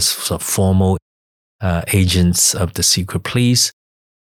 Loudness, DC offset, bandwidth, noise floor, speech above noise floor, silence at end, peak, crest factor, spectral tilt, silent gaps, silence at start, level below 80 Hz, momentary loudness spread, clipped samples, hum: -15 LUFS; under 0.1%; 17.5 kHz; under -90 dBFS; over 74 dB; 0.6 s; -4 dBFS; 14 dB; -3.5 dB/octave; 1.02-1.59 s; 0 s; -38 dBFS; 7 LU; under 0.1%; none